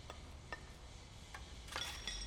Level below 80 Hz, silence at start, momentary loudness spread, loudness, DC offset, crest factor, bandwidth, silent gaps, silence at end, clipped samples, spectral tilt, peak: -56 dBFS; 0 s; 12 LU; -49 LUFS; under 0.1%; 22 dB; 19 kHz; none; 0 s; under 0.1%; -2.5 dB/octave; -26 dBFS